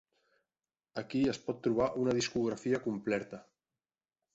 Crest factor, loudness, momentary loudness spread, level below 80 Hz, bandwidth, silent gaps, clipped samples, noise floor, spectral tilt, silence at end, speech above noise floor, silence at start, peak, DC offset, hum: 16 dB; -34 LUFS; 13 LU; -66 dBFS; 8.2 kHz; none; under 0.1%; under -90 dBFS; -5.5 dB/octave; 0.95 s; over 57 dB; 0.95 s; -18 dBFS; under 0.1%; none